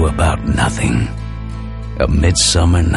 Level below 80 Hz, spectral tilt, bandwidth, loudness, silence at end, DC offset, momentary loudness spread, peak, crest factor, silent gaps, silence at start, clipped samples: -20 dBFS; -4.5 dB/octave; 11.5 kHz; -15 LUFS; 0 s; under 0.1%; 15 LU; -2 dBFS; 14 dB; none; 0 s; under 0.1%